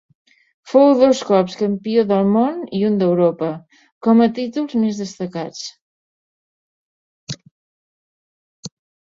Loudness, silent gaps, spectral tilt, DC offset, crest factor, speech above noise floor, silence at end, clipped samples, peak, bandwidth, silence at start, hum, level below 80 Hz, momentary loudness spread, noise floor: -17 LUFS; 3.92-4.01 s, 5.81-7.27 s, 7.51-8.63 s; -6.5 dB/octave; under 0.1%; 18 dB; over 74 dB; 0.5 s; under 0.1%; -2 dBFS; 7.8 kHz; 0.65 s; none; -64 dBFS; 19 LU; under -90 dBFS